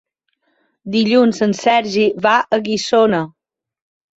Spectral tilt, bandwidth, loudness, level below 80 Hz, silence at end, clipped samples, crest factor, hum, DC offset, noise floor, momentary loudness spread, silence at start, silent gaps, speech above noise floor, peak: -5 dB/octave; 8 kHz; -15 LUFS; -60 dBFS; 0.9 s; under 0.1%; 16 dB; none; under 0.1%; -67 dBFS; 8 LU; 0.85 s; none; 53 dB; -2 dBFS